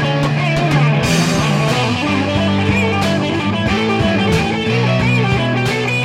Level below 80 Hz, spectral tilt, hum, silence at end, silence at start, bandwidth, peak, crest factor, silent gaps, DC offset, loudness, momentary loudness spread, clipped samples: -36 dBFS; -5.5 dB/octave; none; 0 s; 0 s; 15 kHz; -2 dBFS; 12 dB; none; under 0.1%; -15 LUFS; 3 LU; under 0.1%